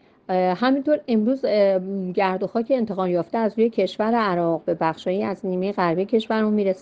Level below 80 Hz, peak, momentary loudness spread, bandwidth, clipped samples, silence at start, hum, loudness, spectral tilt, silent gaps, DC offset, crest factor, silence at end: -64 dBFS; -6 dBFS; 5 LU; 7.8 kHz; under 0.1%; 0.3 s; none; -22 LUFS; -8 dB/octave; none; under 0.1%; 16 dB; 0 s